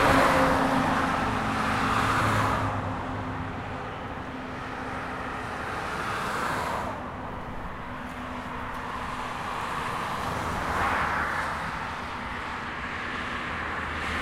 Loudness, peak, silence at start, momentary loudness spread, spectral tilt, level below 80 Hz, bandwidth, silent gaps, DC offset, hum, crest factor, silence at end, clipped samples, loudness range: -29 LUFS; -8 dBFS; 0 s; 12 LU; -5 dB/octave; -44 dBFS; 16 kHz; none; under 0.1%; none; 20 dB; 0 s; under 0.1%; 7 LU